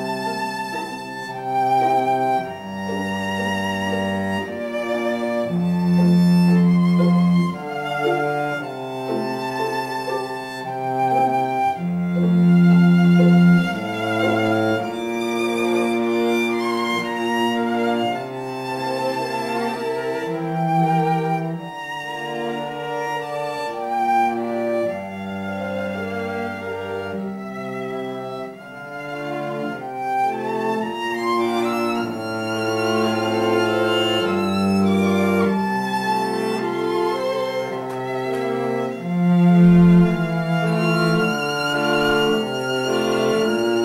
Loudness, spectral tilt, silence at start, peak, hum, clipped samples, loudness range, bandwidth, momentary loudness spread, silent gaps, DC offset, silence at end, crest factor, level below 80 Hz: -20 LUFS; -7 dB/octave; 0 s; -4 dBFS; none; under 0.1%; 8 LU; 14 kHz; 12 LU; none; under 0.1%; 0 s; 16 dB; -52 dBFS